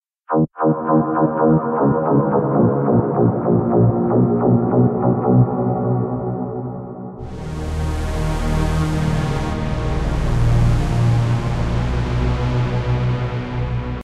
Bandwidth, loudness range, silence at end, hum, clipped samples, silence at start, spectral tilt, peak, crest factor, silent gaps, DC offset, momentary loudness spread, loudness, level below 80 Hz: 11 kHz; 6 LU; 0 s; none; under 0.1%; 0.3 s; -8.5 dB/octave; -2 dBFS; 14 dB; none; under 0.1%; 8 LU; -18 LUFS; -28 dBFS